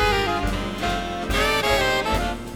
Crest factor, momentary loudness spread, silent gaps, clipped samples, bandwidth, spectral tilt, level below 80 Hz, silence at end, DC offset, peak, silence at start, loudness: 14 dB; 6 LU; none; under 0.1%; over 20 kHz; -4 dB/octave; -32 dBFS; 0 s; 0.2%; -8 dBFS; 0 s; -22 LUFS